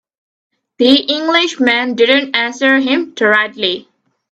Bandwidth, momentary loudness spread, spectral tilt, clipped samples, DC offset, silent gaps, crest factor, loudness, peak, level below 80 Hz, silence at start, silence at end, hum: 8.2 kHz; 5 LU; -3 dB/octave; under 0.1%; under 0.1%; none; 14 dB; -12 LUFS; 0 dBFS; -62 dBFS; 0.8 s; 0.5 s; none